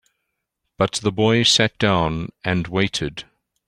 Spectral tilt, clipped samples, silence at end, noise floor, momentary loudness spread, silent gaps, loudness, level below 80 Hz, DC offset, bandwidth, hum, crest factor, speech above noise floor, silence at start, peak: -4 dB/octave; under 0.1%; 0.45 s; -77 dBFS; 11 LU; none; -19 LUFS; -46 dBFS; under 0.1%; 15.5 kHz; none; 20 dB; 58 dB; 0.8 s; -2 dBFS